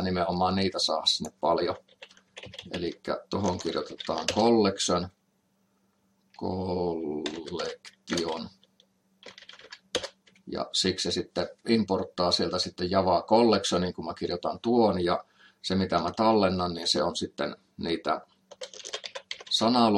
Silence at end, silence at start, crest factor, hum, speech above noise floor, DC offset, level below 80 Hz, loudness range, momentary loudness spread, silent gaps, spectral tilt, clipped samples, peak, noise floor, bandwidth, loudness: 0 s; 0 s; 20 dB; none; 44 dB; under 0.1%; -66 dBFS; 8 LU; 16 LU; none; -4.5 dB/octave; under 0.1%; -8 dBFS; -71 dBFS; 12.5 kHz; -28 LUFS